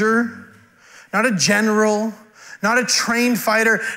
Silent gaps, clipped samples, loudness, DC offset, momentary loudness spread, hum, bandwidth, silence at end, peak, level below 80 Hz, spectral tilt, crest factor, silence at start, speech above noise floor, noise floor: none; under 0.1%; -17 LUFS; under 0.1%; 8 LU; none; 16 kHz; 0 s; -4 dBFS; -66 dBFS; -3 dB/octave; 14 dB; 0 s; 30 dB; -48 dBFS